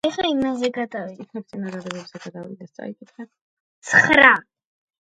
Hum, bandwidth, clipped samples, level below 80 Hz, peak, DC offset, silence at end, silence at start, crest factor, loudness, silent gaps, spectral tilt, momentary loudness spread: none; 11 kHz; under 0.1%; -58 dBFS; 0 dBFS; under 0.1%; 0.65 s; 0.05 s; 22 dB; -17 LUFS; 3.41-3.82 s; -4 dB/octave; 24 LU